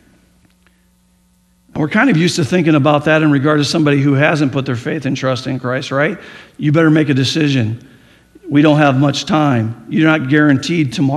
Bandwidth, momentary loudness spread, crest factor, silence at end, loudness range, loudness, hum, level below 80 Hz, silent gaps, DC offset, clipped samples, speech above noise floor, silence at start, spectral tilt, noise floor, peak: 12 kHz; 8 LU; 14 dB; 0 s; 3 LU; -14 LUFS; none; -54 dBFS; none; under 0.1%; under 0.1%; 42 dB; 1.75 s; -6 dB/octave; -55 dBFS; 0 dBFS